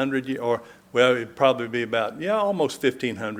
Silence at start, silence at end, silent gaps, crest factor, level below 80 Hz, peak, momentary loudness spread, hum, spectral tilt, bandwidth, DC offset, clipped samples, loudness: 0 s; 0 s; none; 20 dB; -66 dBFS; -4 dBFS; 7 LU; none; -5 dB/octave; 16 kHz; under 0.1%; under 0.1%; -24 LUFS